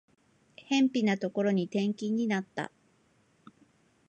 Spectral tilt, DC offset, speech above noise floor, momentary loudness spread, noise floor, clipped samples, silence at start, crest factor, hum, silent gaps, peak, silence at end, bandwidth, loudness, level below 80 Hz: -6 dB/octave; under 0.1%; 39 dB; 11 LU; -68 dBFS; under 0.1%; 0.6 s; 18 dB; none; none; -14 dBFS; 1.4 s; 8.8 kHz; -30 LUFS; -80 dBFS